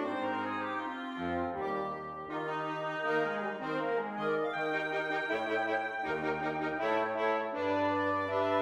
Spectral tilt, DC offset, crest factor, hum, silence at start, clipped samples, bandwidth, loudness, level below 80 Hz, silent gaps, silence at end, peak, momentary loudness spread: -6 dB/octave; under 0.1%; 16 dB; none; 0 s; under 0.1%; 11 kHz; -33 LUFS; -68 dBFS; none; 0 s; -18 dBFS; 5 LU